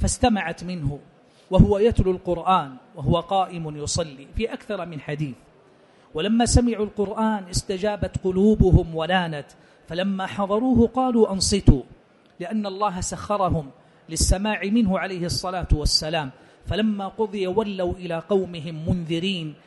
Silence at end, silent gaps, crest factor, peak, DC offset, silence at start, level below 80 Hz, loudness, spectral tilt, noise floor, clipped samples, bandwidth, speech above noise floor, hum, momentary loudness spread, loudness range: 0.1 s; none; 22 dB; 0 dBFS; under 0.1%; 0 s; -32 dBFS; -23 LUFS; -5.5 dB/octave; -54 dBFS; under 0.1%; 11.5 kHz; 32 dB; none; 12 LU; 4 LU